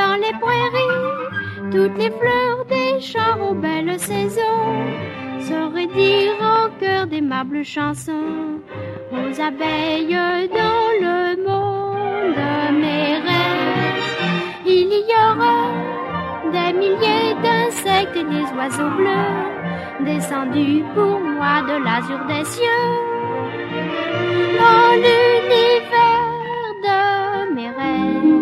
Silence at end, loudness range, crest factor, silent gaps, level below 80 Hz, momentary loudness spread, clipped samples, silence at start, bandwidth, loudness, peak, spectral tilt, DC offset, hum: 0 s; 6 LU; 18 dB; none; -56 dBFS; 10 LU; under 0.1%; 0 s; 14 kHz; -18 LUFS; 0 dBFS; -5 dB/octave; under 0.1%; none